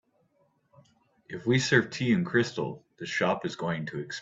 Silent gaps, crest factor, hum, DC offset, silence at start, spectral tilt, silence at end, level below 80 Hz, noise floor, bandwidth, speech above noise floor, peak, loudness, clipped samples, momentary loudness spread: none; 22 dB; none; under 0.1%; 1.3 s; -5 dB/octave; 0 s; -66 dBFS; -70 dBFS; 8 kHz; 42 dB; -8 dBFS; -28 LUFS; under 0.1%; 12 LU